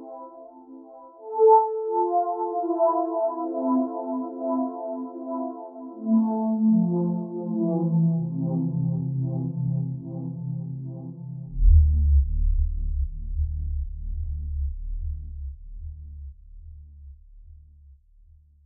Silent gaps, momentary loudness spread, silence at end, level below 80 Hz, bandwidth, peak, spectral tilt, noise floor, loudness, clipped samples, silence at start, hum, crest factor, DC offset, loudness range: none; 21 LU; 0.7 s; -30 dBFS; 1.5 kHz; -6 dBFS; -13 dB/octave; -54 dBFS; -25 LUFS; under 0.1%; 0 s; none; 18 dB; under 0.1%; 13 LU